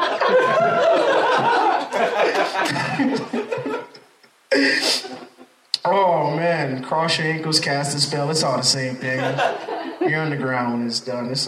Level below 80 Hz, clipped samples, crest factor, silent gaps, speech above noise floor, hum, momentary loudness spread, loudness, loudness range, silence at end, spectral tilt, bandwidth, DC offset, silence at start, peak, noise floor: -70 dBFS; under 0.1%; 18 dB; none; 32 dB; none; 9 LU; -20 LUFS; 3 LU; 0 s; -3.5 dB/octave; 15 kHz; under 0.1%; 0 s; -2 dBFS; -53 dBFS